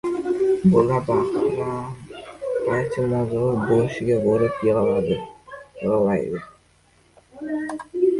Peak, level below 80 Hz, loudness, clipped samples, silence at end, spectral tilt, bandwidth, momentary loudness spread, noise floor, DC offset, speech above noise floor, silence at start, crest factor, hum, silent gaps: -4 dBFS; -50 dBFS; -22 LUFS; under 0.1%; 0 s; -8.5 dB/octave; 11.5 kHz; 15 LU; -58 dBFS; under 0.1%; 37 dB; 0.05 s; 18 dB; none; none